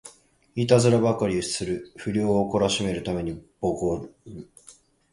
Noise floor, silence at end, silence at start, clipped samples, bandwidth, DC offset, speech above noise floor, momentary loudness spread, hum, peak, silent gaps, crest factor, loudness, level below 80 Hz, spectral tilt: -54 dBFS; 0.4 s; 0.05 s; under 0.1%; 11.5 kHz; under 0.1%; 30 dB; 16 LU; none; -4 dBFS; none; 22 dB; -24 LUFS; -50 dBFS; -5.5 dB/octave